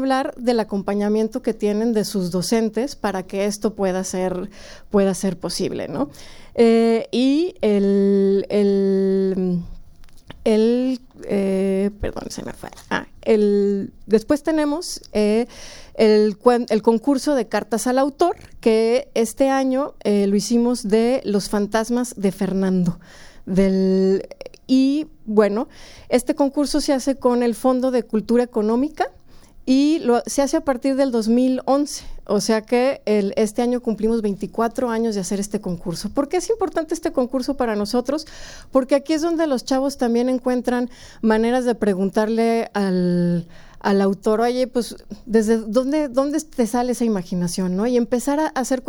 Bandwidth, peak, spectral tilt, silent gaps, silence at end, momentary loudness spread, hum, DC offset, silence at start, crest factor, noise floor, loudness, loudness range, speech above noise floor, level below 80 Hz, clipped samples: 18 kHz; -2 dBFS; -6 dB/octave; none; 0 s; 9 LU; none; under 0.1%; 0 s; 18 dB; -41 dBFS; -20 LUFS; 4 LU; 21 dB; -44 dBFS; under 0.1%